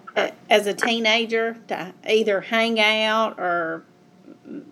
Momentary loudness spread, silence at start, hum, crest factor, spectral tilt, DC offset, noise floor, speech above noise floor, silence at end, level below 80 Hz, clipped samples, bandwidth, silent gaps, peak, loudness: 13 LU; 0.05 s; none; 20 dB; -3 dB/octave; under 0.1%; -49 dBFS; 27 dB; 0.1 s; -82 dBFS; under 0.1%; 15 kHz; none; -4 dBFS; -21 LUFS